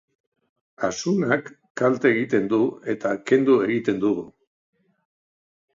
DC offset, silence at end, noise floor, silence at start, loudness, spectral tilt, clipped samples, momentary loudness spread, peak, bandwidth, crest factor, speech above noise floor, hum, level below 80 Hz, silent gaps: under 0.1%; 1.45 s; under -90 dBFS; 0.8 s; -22 LUFS; -6 dB/octave; under 0.1%; 9 LU; -4 dBFS; 7.6 kHz; 20 dB; over 69 dB; none; -66 dBFS; 1.70-1.75 s